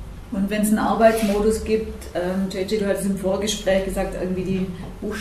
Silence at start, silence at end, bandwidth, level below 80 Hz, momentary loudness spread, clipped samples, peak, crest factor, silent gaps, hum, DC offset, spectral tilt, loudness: 0 s; 0 s; 14.5 kHz; -38 dBFS; 11 LU; under 0.1%; -4 dBFS; 18 dB; none; none; under 0.1%; -5.5 dB/octave; -22 LUFS